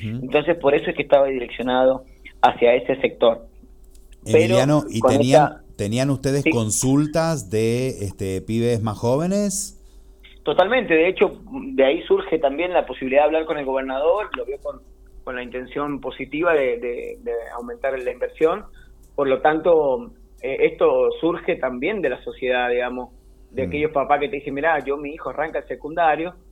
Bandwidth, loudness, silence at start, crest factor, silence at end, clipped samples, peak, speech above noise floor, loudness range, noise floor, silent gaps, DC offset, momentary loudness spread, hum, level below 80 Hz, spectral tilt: 17 kHz; -21 LUFS; 0 s; 20 dB; 0.2 s; under 0.1%; 0 dBFS; 25 dB; 5 LU; -45 dBFS; none; under 0.1%; 12 LU; none; -46 dBFS; -5 dB/octave